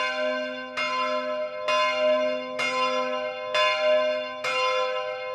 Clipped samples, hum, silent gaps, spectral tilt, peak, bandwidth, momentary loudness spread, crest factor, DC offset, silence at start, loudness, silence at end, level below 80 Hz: under 0.1%; none; none; -1.5 dB/octave; -10 dBFS; 11 kHz; 7 LU; 16 dB; under 0.1%; 0 s; -25 LUFS; 0 s; -74 dBFS